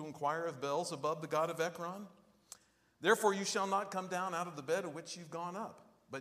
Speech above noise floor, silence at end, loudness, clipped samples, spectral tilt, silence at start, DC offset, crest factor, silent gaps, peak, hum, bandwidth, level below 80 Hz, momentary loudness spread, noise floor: 23 dB; 0 s; -37 LUFS; under 0.1%; -3.5 dB/octave; 0 s; under 0.1%; 22 dB; none; -16 dBFS; none; 15.5 kHz; -86 dBFS; 17 LU; -60 dBFS